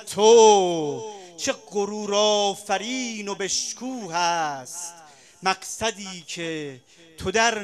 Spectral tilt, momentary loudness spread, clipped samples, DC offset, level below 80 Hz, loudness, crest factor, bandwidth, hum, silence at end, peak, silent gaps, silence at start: -2.5 dB/octave; 17 LU; under 0.1%; under 0.1%; -60 dBFS; -22 LUFS; 20 dB; 13.5 kHz; none; 0 s; -4 dBFS; none; 0 s